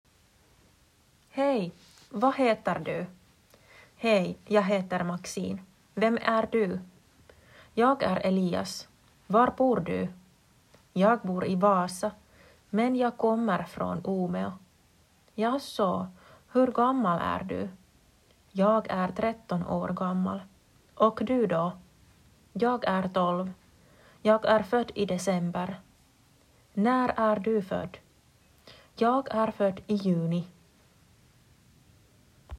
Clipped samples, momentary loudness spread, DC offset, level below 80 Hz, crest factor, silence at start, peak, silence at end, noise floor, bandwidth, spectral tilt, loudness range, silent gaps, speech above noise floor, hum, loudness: under 0.1%; 13 LU; under 0.1%; -62 dBFS; 20 dB; 1.35 s; -10 dBFS; 0 s; -63 dBFS; 14 kHz; -6.5 dB/octave; 3 LU; none; 36 dB; none; -28 LUFS